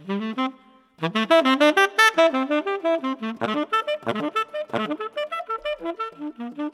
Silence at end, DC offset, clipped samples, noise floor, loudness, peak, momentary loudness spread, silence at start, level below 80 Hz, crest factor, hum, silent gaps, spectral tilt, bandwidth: 0.05 s; under 0.1%; under 0.1%; -52 dBFS; -22 LUFS; -2 dBFS; 14 LU; 0 s; -68 dBFS; 20 dB; none; none; -4 dB/octave; 15.5 kHz